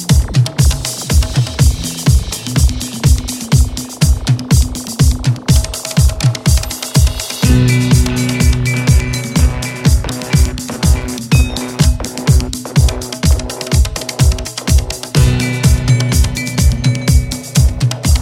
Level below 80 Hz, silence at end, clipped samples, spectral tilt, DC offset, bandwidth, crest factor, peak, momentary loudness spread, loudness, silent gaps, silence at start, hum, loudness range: -16 dBFS; 0 s; under 0.1%; -5 dB/octave; under 0.1%; 16.5 kHz; 12 dB; 0 dBFS; 4 LU; -14 LUFS; none; 0 s; none; 2 LU